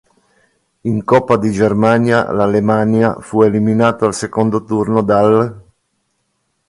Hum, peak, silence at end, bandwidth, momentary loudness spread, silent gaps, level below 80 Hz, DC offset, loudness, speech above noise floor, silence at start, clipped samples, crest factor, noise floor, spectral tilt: none; 0 dBFS; 1.1 s; 11.5 kHz; 6 LU; none; -48 dBFS; under 0.1%; -14 LUFS; 54 dB; 0.85 s; under 0.1%; 14 dB; -67 dBFS; -7 dB/octave